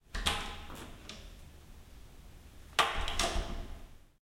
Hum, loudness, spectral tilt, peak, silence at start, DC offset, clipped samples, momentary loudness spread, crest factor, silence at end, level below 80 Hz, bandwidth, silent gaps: none; -35 LUFS; -2.5 dB/octave; -10 dBFS; 0.1 s; under 0.1%; under 0.1%; 25 LU; 28 dB; 0.15 s; -44 dBFS; 16.5 kHz; none